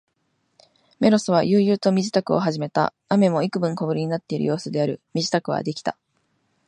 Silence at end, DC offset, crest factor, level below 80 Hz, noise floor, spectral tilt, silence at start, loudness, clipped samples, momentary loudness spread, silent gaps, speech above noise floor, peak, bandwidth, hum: 0.75 s; under 0.1%; 18 dB; -66 dBFS; -70 dBFS; -6 dB/octave; 1 s; -22 LUFS; under 0.1%; 7 LU; none; 49 dB; -4 dBFS; 10.5 kHz; none